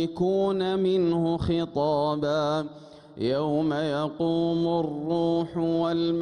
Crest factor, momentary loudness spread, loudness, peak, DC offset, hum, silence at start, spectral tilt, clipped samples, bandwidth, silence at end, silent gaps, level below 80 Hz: 10 dB; 4 LU; -26 LUFS; -14 dBFS; under 0.1%; none; 0 s; -7.5 dB/octave; under 0.1%; 9.8 kHz; 0 s; none; -54 dBFS